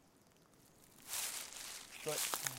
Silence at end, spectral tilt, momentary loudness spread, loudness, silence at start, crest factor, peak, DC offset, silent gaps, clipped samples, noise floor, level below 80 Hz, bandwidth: 0 s; -0.5 dB/octave; 15 LU; -41 LUFS; 0.05 s; 32 dB; -14 dBFS; under 0.1%; none; under 0.1%; -68 dBFS; -76 dBFS; 17 kHz